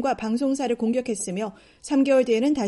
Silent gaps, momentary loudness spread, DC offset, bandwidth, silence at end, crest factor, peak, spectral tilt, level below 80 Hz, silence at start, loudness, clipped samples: none; 11 LU; under 0.1%; 11.5 kHz; 0 s; 14 dB; -8 dBFS; -5 dB/octave; -58 dBFS; 0 s; -23 LUFS; under 0.1%